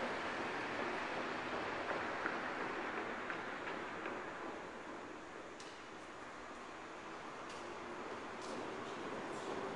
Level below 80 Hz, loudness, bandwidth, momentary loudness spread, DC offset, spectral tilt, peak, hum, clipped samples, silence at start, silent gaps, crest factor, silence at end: -74 dBFS; -44 LUFS; 11.5 kHz; 10 LU; under 0.1%; -4 dB/octave; -22 dBFS; none; under 0.1%; 0 s; none; 24 dB; 0 s